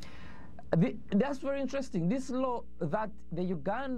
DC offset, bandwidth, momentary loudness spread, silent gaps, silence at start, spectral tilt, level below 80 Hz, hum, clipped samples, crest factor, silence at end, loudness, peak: 1%; 10 kHz; 14 LU; none; 0 s; -7.5 dB/octave; -56 dBFS; none; under 0.1%; 20 dB; 0 s; -33 LUFS; -14 dBFS